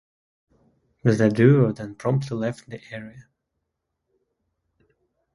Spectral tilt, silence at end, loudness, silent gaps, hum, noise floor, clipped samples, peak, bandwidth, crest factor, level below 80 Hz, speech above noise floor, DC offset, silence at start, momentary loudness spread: -8.5 dB/octave; 2.15 s; -21 LUFS; none; none; -80 dBFS; under 0.1%; -4 dBFS; 11.5 kHz; 22 dB; -60 dBFS; 59 dB; under 0.1%; 1.05 s; 21 LU